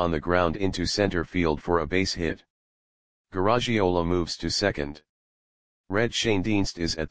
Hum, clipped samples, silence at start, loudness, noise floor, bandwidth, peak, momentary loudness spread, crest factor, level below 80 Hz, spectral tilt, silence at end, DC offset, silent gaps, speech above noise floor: none; under 0.1%; 0 s; -26 LUFS; under -90 dBFS; 10 kHz; -6 dBFS; 6 LU; 22 dB; -44 dBFS; -5 dB/octave; 0 s; 0.9%; 2.50-3.25 s, 5.09-5.84 s; over 65 dB